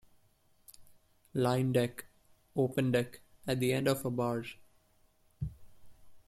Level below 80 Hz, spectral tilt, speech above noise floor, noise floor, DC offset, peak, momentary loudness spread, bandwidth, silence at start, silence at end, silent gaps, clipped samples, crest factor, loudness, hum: -60 dBFS; -6 dB/octave; 36 dB; -68 dBFS; under 0.1%; -16 dBFS; 13 LU; 15 kHz; 0.8 s; 0.1 s; none; under 0.1%; 18 dB; -33 LUFS; none